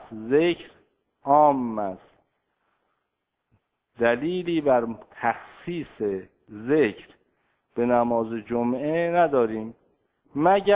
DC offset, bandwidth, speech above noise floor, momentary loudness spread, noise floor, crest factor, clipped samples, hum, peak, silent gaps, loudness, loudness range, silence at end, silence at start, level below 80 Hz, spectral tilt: under 0.1%; 4 kHz; 57 dB; 14 LU; -80 dBFS; 20 dB; under 0.1%; none; -6 dBFS; none; -24 LUFS; 4 LU; 0 s; 0 s; -62 dBFS; -10 dB/octave